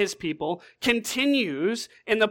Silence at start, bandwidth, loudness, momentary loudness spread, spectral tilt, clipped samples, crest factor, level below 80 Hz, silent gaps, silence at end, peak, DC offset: 0 s; 17.5 kHz; -26 LUFS; 8 LU; -3.5 dB/octave; under 0.1%; 18 dB; -62 dBFS; none; 0 s; -8 dBFS; under 0.1%